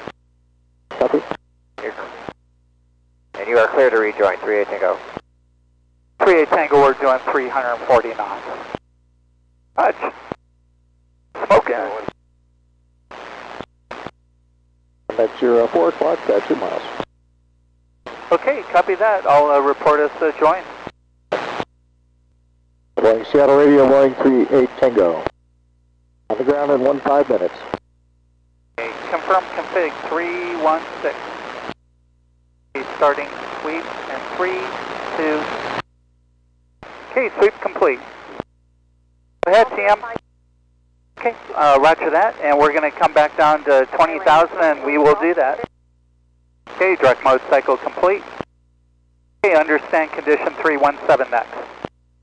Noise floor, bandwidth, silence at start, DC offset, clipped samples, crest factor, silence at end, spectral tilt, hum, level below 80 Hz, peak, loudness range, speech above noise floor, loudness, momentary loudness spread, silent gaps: -58 dBFS; 9.6 kHz; 0 s; under 0.1%; under 0.1%; 12 dB; 0.45 s; -5.5 dB/octave; 60 Hz at -60 dBFS; -54 dBFS; -6 dBFS; 9 LU; 42 dB; -17 LUFS; 20 LU; none